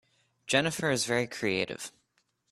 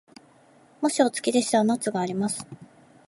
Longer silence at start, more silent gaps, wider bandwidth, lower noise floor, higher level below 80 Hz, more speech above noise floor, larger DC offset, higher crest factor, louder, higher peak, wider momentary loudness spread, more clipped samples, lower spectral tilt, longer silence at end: second, 0.45 s vs 0.8 s; neither; first, 13 kHz vs 11.5 kHz; first, -75 dBFS vs -56 dBFS; first, -66 dBFS vs -72 dBFS; first, 45 dB vs 32 dB; neither; about the same, 24 dB vs 20 dB; second, -29 LUFS vs -25 LUFS; about the same, -8 dBFS vs -6 dBFS; first, 15 LU vs 8 LU; neither; about the same, -3.5 dB/octave vs -4 dB/octave; first, 0.65 s vs 0.45 s